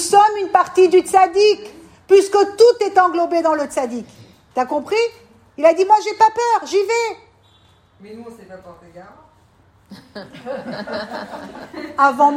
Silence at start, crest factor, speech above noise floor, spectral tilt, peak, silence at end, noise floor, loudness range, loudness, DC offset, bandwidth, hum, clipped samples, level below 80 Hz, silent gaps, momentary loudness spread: 0 s; 16 dB; 37 dB; -3 dB/octave; 0 dBFS; 0 s; -53 dBFS; 18 LU; -16 LUFS; under 0.1%; 15 kHz; none; under 0.1%; -62 dBFS; none; 21 LU